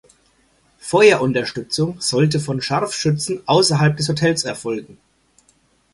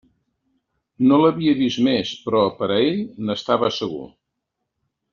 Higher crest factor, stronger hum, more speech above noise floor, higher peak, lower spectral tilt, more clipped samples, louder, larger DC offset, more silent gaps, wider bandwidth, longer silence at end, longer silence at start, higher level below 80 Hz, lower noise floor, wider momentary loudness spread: about the same, 18 dB vs 18 dB; neither; second, 41 dB vs 60 dB; first, 0 dBFS vs -4 dBFS; about the same, -4.5 dB/octave vs -4.5 dB/octave; neither; about the same, -18 LUFS vs -20 LUFS; neither; neither; first, 11.5 kHz vs 7.2 kHz; about the same, 1 s vs 1.05 s; second, 0.85 s vs 1 s; first, -54 dBFS vs -60 dBFS; second, -59 dBFS vs -79 dBFS; about the same, 10 LU vs 10 LU